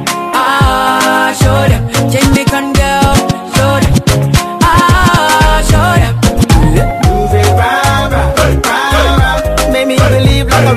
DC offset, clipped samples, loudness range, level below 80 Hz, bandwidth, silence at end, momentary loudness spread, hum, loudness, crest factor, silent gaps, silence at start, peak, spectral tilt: under 0.1%; 0.3%; 1 LU; -16 dBFS; 15 kHz; 0 s; 4 LU; none; -9 LUFS; 8 dB; none; 0 s; 0 dBFS; -5 dB/octave